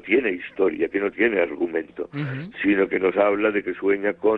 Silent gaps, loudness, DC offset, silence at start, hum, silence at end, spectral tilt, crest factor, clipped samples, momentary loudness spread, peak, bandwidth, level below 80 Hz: none; -23 LUFS; under 0.1%; 0.05 s; none; 0 s; -9 dB/octave; 16 dB; under 0.1%; 9 LU; -6 dBFS; 4.5 kHz; -58 dBFS